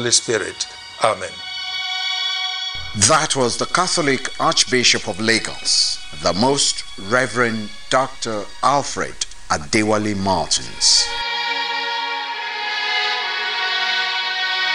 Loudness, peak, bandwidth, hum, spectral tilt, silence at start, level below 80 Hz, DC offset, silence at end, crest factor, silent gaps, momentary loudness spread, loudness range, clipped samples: -18 LUFS; 0 dBFS; 16 kHz; none; -2 dB/octave; 0 s; -48 dBFS; under 0.1%; 0 s; 20 dB; none; 10 LU; 3 LU; under 0.1%